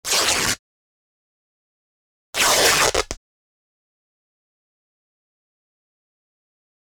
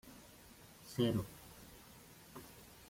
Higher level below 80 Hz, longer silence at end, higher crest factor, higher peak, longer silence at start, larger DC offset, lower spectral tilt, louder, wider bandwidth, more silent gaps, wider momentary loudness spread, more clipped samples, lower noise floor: first, -48 dBFS vs -66 dBFS; first, 3.8 s vs 0.15 s; about the same, 24 dB vs 22 dB; first, -2 dBFS vs -22 dBFS; about the same, 0.05 s vs 0.05 s; neither; second, -0.5 dB/octave vs -6 dB/octave; first, -17 LUFS vs -39 LUFS; first, over 20 kHz vs 16.5 kHz; first, 0.59-2.33 s vs none; second, 15 LU vs 22 LU; neither; first, under -90 dBFS vs -60 dBFS